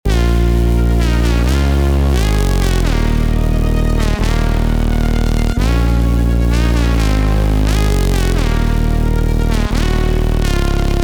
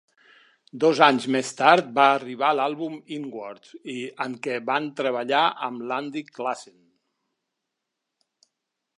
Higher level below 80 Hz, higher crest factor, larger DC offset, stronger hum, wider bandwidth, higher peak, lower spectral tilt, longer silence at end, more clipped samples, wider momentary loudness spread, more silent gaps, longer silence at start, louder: first, -14 dBFS vs -82 dBFS; second, 10 dB vs 24 dB; neither; neither; first, 19 kHz vs 11.5 kHz; about the same, -4 dBFS vs -2 dBFS; first, -6.5 dB/octave vs -4 dB/octave; second, 0 s vs 2.35 s; neither; second, 2 LU vs 16 LU; neither; second, 0.05 s vs 0.75 s; first, -15 LUFS vs -23 LUFS